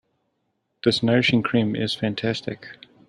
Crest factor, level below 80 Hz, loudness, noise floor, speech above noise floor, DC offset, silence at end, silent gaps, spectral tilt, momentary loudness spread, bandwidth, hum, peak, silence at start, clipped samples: 20 dB; -60 dBFS; -22 LUFS; -74 dBFS; 52 dB; under 0.1%; 0.35 s; none; -6 dB/octave; 15 LU; 11 kHz; none; -4 dBFS; 0.85 s; under 0.1%